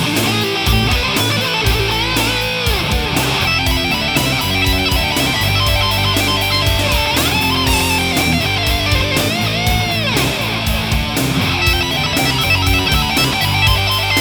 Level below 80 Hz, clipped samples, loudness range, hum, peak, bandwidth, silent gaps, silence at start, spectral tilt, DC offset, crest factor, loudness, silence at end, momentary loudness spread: -24 dBFS; under 0.1%; 1 LU; none; 0 dBFS; over 20 kHz; none; 0 s; -3.5 dB/octave; under 0.1%; 14 dB; -14 LUFS; 0 s; 2 LU